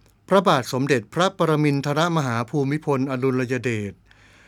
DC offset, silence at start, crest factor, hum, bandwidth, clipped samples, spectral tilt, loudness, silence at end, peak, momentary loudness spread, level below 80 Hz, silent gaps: under 0.1%; 0.3 s; 20 dB; none; 16 kHz; under 0.1%; -6 dB/octave; -22 LUFS; 0.55 s; -2 dBFS; 5 LU; -60 dBFS; none